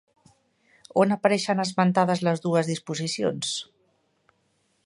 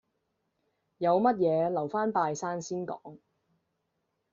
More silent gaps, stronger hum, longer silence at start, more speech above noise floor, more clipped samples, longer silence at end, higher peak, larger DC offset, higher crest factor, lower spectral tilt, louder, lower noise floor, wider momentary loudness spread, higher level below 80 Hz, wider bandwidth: neither; neither; about the same, 0.95 s vs 1 s; second, 46 dB vs 51 dB; neither; about the same, 1.25 s vs 1.15 s; first, -4 dBFS vs -12 dBFS; neither; about the same, 22 dB vs 18 dB; about the same, -5 dB/octave vs -6 dB/octave; first, -24 LUFS vs -29 LUFS; second, -70 dBFS vs -80 dBFS; second, 8 LU vs 11 LU; first, -70 dBFS vs -76 dBFS; first, 11.5 kHz vs 7.6 kHz